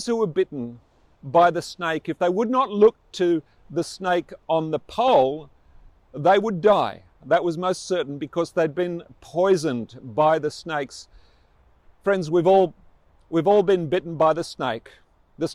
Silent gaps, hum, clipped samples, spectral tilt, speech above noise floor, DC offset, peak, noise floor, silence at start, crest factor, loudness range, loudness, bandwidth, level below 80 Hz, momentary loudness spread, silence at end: none; none; under 0.1%; -6 dB/octave; 36 dB; under 0.1%; -4 dBFS; -57 dBFS; 0 s; 18 dB; 3 LU; -22 LUFS; 12.5 kHz; -58 dBFS; 12 LU; 0 s